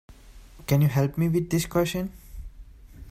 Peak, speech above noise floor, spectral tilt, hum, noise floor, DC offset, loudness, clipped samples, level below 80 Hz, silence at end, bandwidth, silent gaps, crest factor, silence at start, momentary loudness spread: -8 dBFS; 24 dB; -6.5 dB/octave; none; -48 dBFS; under 0.1%; -25 LUFS; under 0.1%; -44 dBFS; 0 s; 16 kHz; none; 18 dB; 0.1 s; 23 LU